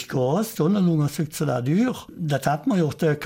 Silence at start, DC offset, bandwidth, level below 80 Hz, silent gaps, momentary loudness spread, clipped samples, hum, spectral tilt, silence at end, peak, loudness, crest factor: 0 s; under 0.1%; 17 kHz; -58 dBFS; none; 5 LU; under 0.1%; none; -7 dB/octave; 0 s; -10 dBFS; -23 LUFS; 12 dB